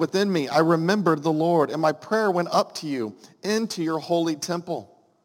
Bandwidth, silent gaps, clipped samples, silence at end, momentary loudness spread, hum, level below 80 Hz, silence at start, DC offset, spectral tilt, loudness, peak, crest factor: 17 kHz; none; under 0.1%; 0.4 s; 9 LU; none; -76 dBFS; 0 s; under 0.1%; -5.5 dB/octave; -24 LUFS; -6 dBFS; 18 dB